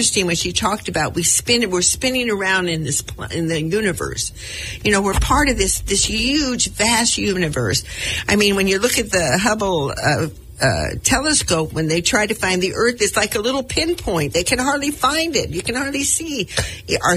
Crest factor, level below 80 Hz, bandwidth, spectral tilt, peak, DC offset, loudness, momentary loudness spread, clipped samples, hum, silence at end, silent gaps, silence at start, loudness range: 18 dB; -34 dBFS; 16 kHz; -3 dB/octave; 0 dBFS; under 0.1%; -18 LUFS; 6 LU; under 0.1%; none; 0 s; none; 0 s; 2 LU